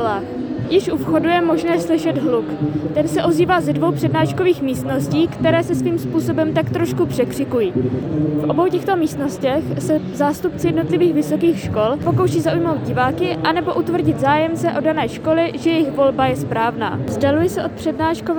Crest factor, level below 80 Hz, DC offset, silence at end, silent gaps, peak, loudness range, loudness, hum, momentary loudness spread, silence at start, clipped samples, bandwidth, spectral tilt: 14 dB; -46 dBFS; under 0.1%; 0 s; none; -4 dBFS; 1 LU; -18 LUFS; none; 4 LU; 0 s; under 0.1%; over 20 kHz; -6.5 dB/octave